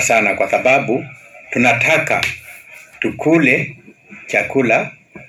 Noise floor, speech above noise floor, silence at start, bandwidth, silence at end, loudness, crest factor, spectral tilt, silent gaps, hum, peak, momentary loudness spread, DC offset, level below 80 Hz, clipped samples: -40 dBFS; 25 dB; 0 s; 16 kHz; 0.05 s; -15 LUFS; 16 dB; -4.5 dB/octave; none; none; 0 dBFS; 15 LU; under 0.1%; -54 dBFS; under 0.1%